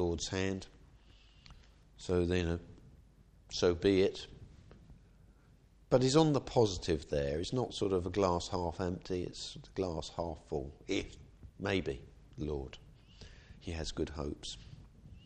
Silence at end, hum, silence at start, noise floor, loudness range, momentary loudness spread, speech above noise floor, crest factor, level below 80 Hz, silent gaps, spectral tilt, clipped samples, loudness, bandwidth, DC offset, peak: 0.05 s; none; 0 s; -63 dBFS; 8 LU; 20 LU; 29 dB; 22 dB; -52 dBFS; none; -5.5 dB/octave; under 0.1%; -35 LUFS; 9.6 kHz; under 0.1%; -14 dBFS